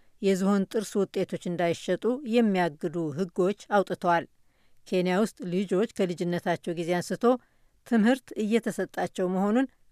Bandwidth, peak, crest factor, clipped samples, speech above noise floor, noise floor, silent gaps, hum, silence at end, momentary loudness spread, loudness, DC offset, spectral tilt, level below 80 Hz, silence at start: 14.5 kHz; -12 dBFS; 16 dB; under 0.1%; 32 dB; -59 dBFS; none; none; 0.25 s; 6 LU; -27 LUFS; under 0.1%; -6 dB/octave; -68 dBFS; 0.2 s